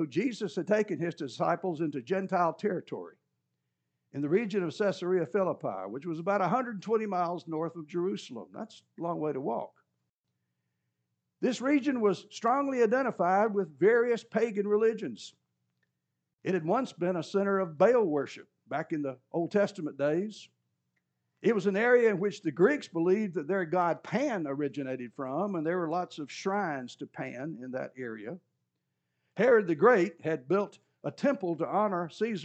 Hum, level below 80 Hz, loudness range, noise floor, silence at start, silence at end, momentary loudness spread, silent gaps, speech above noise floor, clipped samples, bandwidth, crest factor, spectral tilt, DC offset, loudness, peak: none; under -90 dBFS; 7 LU; -84 dBFS; 0 s; 0 s; 15 LU; 10.09-10.24 s; 54 dB; under 0.1%; 8.6 kHz; 22 dB; -6.5 dB/octave; under 0.1%; -30 LUFS; -10 dBFS